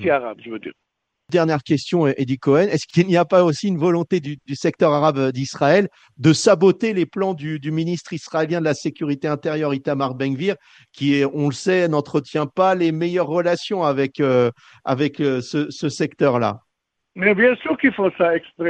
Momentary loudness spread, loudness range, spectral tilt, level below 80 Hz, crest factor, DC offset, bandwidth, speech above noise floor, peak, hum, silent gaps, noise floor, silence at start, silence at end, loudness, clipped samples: 9 LU; 4 LU; -6 dB/octave; -64 dBFS; 18 dB; under 0.1%; 9.6 kHz; 58 dB; -2 dBFS; none; none; -77 dBFS; 0 s; 0 s; -19 LUFS; under 0.1%